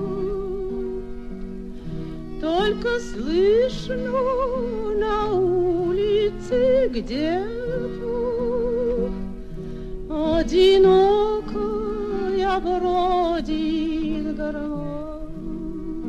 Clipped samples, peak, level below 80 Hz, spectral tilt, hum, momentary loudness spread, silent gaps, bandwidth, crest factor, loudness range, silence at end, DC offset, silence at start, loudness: under 0.1%; -6 dBFS; -36 dBFS; -6.5 dB/octave; none; 15 LU; none; 8.6 kHz; 16 dB; 6 LU; 0 s; under 0.1%; 0 s; -22 LUFS